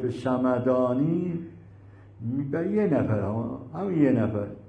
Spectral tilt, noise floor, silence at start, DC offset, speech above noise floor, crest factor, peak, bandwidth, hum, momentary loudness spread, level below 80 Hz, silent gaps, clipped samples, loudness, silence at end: -10 dB/octave; -49 dBFS; 0 s; under 0.1%; 23 dB; 16 dB; -10 dBFS; 8.8 kHz; none; 10 LU; -58 dBFS; none; under 0.1%; -26 LUFS; 0 s